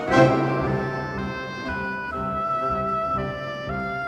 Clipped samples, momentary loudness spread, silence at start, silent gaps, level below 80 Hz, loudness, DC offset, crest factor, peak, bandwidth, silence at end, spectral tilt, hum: under 0.1%; 11 LU; 0 s; none; -44 dBFS; -25 LUFS; under 0.1%; 20 dB; -4 dBFS; 10 kHz; 0 s; -7 dB/octave; none